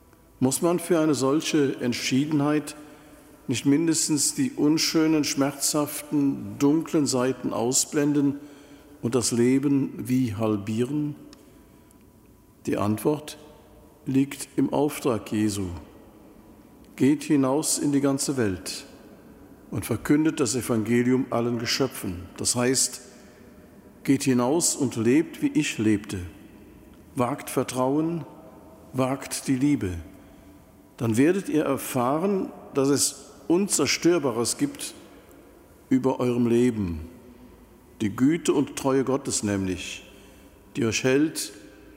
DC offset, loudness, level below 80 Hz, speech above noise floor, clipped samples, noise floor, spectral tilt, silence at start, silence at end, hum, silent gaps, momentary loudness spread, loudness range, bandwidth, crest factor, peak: under 0.1%; -24 LUFS; -56 dBFS; 30 dB; under 0.1%; -54 dBFS; -4.5 dB/octave; 0.4 s; 0.3 s; none; none; 12 LU; 5 LU; 16 kHz; 16 dB; -8 dBFS